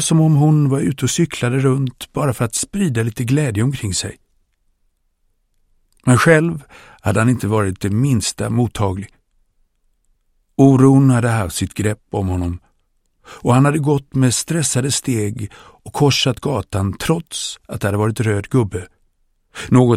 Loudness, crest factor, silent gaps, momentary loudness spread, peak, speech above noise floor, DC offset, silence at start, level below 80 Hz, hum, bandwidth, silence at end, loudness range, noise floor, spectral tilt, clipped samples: -17 LUFS; 18 dB; none; 12 LU; 0 dBFS; 48 dB; under 0.1%; 0 s; -44 dBFS; none; 15 kHz; 0 s; 4 LU; -64 dBFS; -5.5 dB/octave; under 0.1%